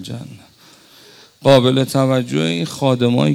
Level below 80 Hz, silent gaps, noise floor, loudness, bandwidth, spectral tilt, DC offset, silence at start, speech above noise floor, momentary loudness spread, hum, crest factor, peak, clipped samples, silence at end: -54 dBFS; none; -47 dBFS; -16 LUFS; 15 kHz; -6 dB/octave; under 0.1%; 0 s; 32 dB; 17 LU; none; 16 dB; -2 dBFS; under 0.1%; 0 s